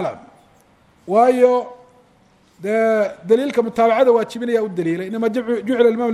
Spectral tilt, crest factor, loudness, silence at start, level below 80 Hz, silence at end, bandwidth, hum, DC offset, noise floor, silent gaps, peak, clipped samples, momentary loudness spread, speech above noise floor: -6.5 dB/octave; 16 dB; -17 LUFS; 0 s; -64 dBFS; 0 s; 12.5 kHz; none; under 0.1%; -54 dBFS; none; -2 dBFS; under 0.1%; 9 LU; 37 dB